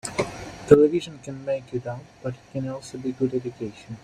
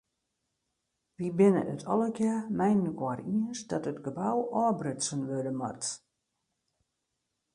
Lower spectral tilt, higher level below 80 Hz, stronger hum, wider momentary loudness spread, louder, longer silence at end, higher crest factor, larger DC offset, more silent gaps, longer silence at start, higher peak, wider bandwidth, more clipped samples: about the same, -6.5 dB/octave vs -6 dB/octave; first, -54 dBFS vs -72 dBFS; neither; first, 19 LU vs 10 LU; first, -25 LUFS vs -30 LUFS; second, 0.05 s vs 1.6 s; about the same, 22 dB vs 20 dB; neither; neither; second, 0.05 s vs 1.2 s; first, -2 dBFS vs -12 dBFS; about the same, 11.5 kHz vs 11 kHz; neither